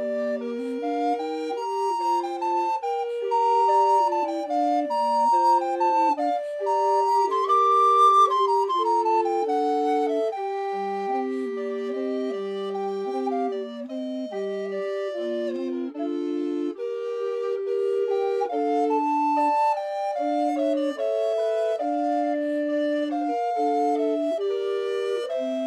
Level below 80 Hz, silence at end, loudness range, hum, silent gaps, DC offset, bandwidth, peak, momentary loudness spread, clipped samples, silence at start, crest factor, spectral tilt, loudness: -80 dBFS; 0 s; 9 LU; none; none; under 0.1%; 13 kHz; -10 dBFS; 9 LU; under 0.1%; 0 s; 14 dB; -4.5 dB/octave; -24 LUFS